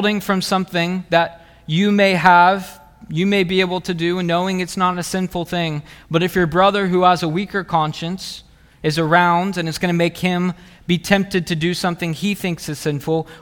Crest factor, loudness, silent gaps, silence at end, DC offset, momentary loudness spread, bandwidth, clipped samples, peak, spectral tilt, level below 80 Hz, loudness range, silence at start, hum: 18 dB; -18 LUFS; none; 0.05 s; under 0.1%; 10 LU; 18.5 kHz; under 0.1%; 0 dBFS; -5.5 dB/octave; -48 dBFS; 3 LU; 0 s; none